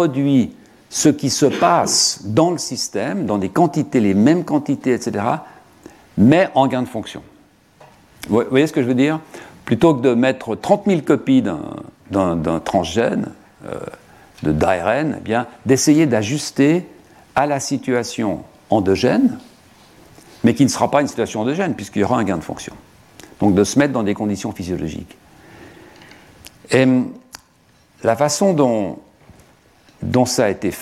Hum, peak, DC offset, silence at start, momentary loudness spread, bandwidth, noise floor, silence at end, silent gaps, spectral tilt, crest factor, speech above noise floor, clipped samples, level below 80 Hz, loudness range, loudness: none; 0 dBFS; under 0.1%; 0 s; 14 LU; 15 kHz; -54 dBFS; 0 s; none; -5 dB/octave; 18 dB; 37 dB; under 0.1%; -50 dBFS; 4 LU; -17 LUFS